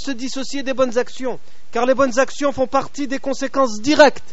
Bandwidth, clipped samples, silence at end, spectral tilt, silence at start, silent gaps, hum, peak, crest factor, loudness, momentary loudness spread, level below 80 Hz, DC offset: 8 kHz; under 0.1%; 0.1 s; -2 dB/octave; 0 s; none; none; 0 dBFS; 18 dB; -19 LUFS; 13 LU; -52 dBFS; 6%